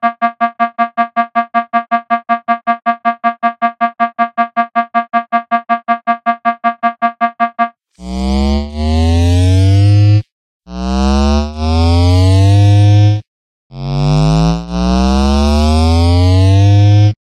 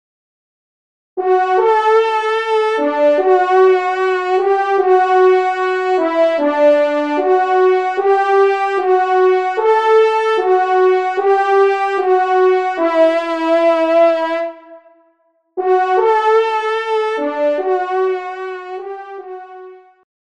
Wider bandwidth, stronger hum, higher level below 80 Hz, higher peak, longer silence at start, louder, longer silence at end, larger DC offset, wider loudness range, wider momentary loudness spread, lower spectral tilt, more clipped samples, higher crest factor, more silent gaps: first, 9.8 kHz vs 8.4 kHz; neither; first, -22 dBFS vs -70 dBFS; about the same, 0 dBFS vs -2 dBFS; second, 0 s vs 1.15 s; about the same, -12 LUFS vs -14 LUFS; second, 0.1 s vs 0.6 s; second, under 0.1% vs 0.2%; about the same, 4 LU vs 4 LU; second, 7 LU vs 10 LU; first, -7 dB/octave vs -3 dB/octave; neither; about the same, 12 dB vs 14 dB; first, 10.32-10.60 s, 13.27-13.70 s vs none